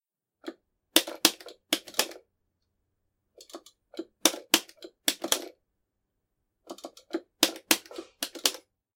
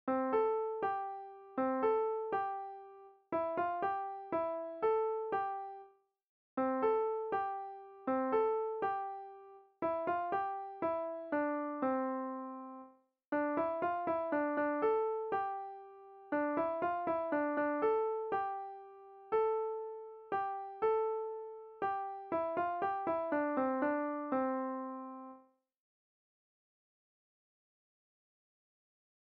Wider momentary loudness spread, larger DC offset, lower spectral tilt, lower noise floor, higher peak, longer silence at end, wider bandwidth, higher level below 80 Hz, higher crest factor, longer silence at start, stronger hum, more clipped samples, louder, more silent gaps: first, 22 LU vs 15 LU; neither; second, 0.5 dB/octave vs -4.5 dB/octave; first, -81 dBFS vs -62 dBFS; first, 0 dBFS vs -22 dBFS; second, 0.35 s vs 3.85 s; first, 17 kHz vs 4.6 kHz; about the same, -80 dBFS vs -78 dBFS; first, 32 dB vs 16 dB; first, 0.45 s vs 0.05 s; neither; neither; first, -27 LUFS vs -36 LUFS; second, none vs 6.29-6.57 s, 13.28-13.32 s